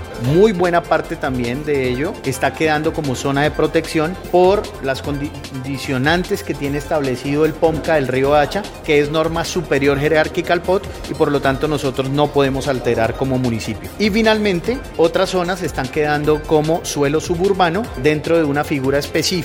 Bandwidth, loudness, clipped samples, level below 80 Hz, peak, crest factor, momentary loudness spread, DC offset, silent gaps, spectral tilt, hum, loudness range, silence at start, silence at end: 17 kHz; -17 LUFS; under 0.1%; -36 dBFS; 0 dBFS; 16 dB; 7 LU; under 0.1%; none; -5.5 dB/octave; none; 2 LU; 0 s; 0 s